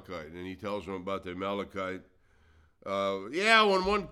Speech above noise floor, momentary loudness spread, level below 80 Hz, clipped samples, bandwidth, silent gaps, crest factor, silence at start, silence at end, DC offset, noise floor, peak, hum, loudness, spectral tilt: 32 dB; 19 LU; -58 dBFS; under 0.1%; 13.5 kHz; none; 24 dB; 0 s; 0 s; under 0.1%; -63 dBFS; -6 dBFS; none; -29 LUFS; -4 dB/octave